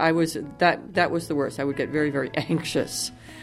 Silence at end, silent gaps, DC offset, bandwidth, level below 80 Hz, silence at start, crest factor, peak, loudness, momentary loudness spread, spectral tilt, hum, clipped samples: 0 s; none; under 0.1%; 15.5 kHz; -56 dBFS; 0 s; 20 dB; -6 dBFS; -25 LUFS; 5 LU; -4.5 dB/octave; none; under 0.1%